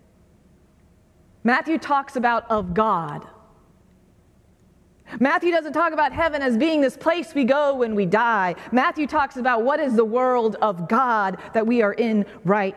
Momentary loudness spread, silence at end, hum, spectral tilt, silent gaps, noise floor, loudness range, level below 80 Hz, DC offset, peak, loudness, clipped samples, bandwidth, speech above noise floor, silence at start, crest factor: 4 LU; 0 s; none; -6.5 dB/octave; none; -56 dBFS; 5 LU; -54 dBFS; under 0.1%; -4 dBFS; -21 LUFS; under 0.1%; 12.5 kHz; 35 dB; 1.45 s; 18 dB